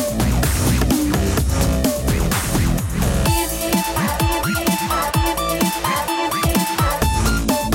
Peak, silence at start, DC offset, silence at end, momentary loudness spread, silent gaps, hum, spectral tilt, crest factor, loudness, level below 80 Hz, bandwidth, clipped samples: -4 dBFS; 0 s; under 0.1%; 0 s; 2 LU; none; none; -4.5 dB/octave; 14 dB; -19 LUFS; -24 dBFS; 17 kHz; under 0.1%